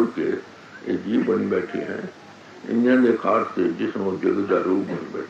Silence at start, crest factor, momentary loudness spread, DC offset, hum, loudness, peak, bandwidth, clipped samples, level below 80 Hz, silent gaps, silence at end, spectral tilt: 0 s; 16 dB; 14 LU; under 0.1%; none; -23 LUFS; -6 dBFS; 7.8 kHz; under 0.1%; -70 dBFS; none; 0 s; -7.5 dB/octave